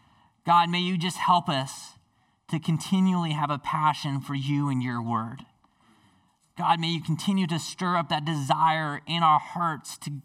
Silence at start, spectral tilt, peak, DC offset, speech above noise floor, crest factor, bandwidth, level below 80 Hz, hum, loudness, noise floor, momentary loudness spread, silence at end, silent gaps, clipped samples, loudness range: 0.45 s; -5.5 dB/octave; -8 dBFS; under 0.1%; 41 dB; 20 dB; 15 kHz; -70 dBFS; none; -26 LUFS; -67 dBFS; 11 LU; 0.05 s; none; under 0.1%; 4 LU